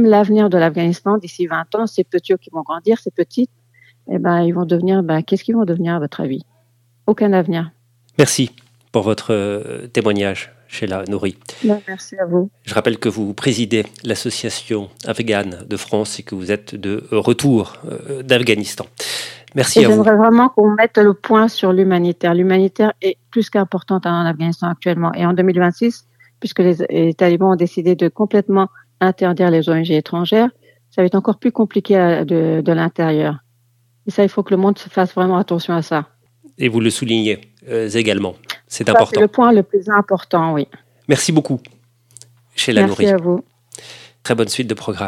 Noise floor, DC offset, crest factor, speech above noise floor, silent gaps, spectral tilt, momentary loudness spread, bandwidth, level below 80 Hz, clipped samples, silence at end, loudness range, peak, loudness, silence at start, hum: -58 dBFS; under 0.1%; 16 dB; 43 dB; none; -5.5 dB/octave; 12 LU; 15 kHz; -62 dBFS; under 0.1%; 0 s; 7 LU; 0 dBFS; -16 LUFS; 0 s; none